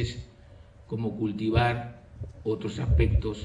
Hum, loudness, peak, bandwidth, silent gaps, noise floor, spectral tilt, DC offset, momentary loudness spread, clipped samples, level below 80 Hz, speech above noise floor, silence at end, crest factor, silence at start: none; -28 LUFS; -10 dBFS; 10 kHz; none; -51 dBFS; -7.5 dB/octave; under 0.1%; 18 LU; under 0.1%; -34 dBFS; 24 dB; 0 s; 18 dB; 0 s